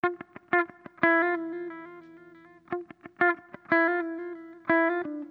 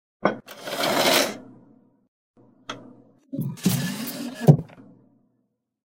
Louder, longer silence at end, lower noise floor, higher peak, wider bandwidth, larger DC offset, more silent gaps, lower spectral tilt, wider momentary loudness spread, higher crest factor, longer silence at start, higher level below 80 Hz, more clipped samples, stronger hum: second, -27 LUFS vs -23 LUFS; second, 0.05 s vs 1.25 s; second, -53 dBFS vs -73 dBFS; second, -6 dBFS vs 0 dBFS; second, 4.7 kHz vs 16 kHz; neither; second, none vs 2.08-2.34 s; first, -8 dB/octave vs -4.5 dB/octave; second, 16 LU vs 21 LU; about the same, 22 dB vs 26 dB; second, 0.05 s vs 0.25 s; second, -74 dBFS vs -62 dBFS; neither; first, 60 Hz at -75 dBFS vs none